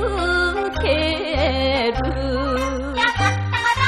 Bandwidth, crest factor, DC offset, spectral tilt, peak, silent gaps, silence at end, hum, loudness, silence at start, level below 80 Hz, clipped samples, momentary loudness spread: 13 kHz; 16 dB; under 0.1%; -5 dB/octave; -4 dBFS; none; 0 s; none; -20 LUFS; 0 s; -30 dBFS; under 0.1%; 4 LU